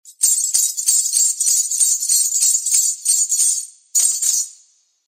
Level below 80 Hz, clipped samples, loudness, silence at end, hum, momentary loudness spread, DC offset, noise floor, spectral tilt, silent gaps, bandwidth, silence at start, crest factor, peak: -84 dBFS; under 0.1%; -14 LUFS; 0.55 s; none; 4 LU; under 0.1%; -55 dBFS; 7.5 dB/octave; none; 16 kHz; 0.05 s; 16 dB; -2 dBFS